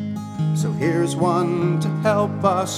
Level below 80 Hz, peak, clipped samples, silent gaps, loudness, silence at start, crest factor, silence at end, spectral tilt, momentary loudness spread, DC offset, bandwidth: -60 dBFS; -4 dBFS; under 0.1%; none; -21 LUFS; 0 s; 16 dB; 0 s; -6.5 dB/octave; 4 LU; under 0.1%; 14 kHz